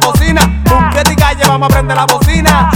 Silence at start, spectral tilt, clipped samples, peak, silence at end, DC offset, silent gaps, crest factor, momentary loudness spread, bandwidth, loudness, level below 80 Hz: 0 s; -4.5 dB/octave; 0.1%; 0 dBFS; 0 s; under 0.1%; none; 8 dB; 2 LU; 19 kHz; -9 LUFS; -16 dBFS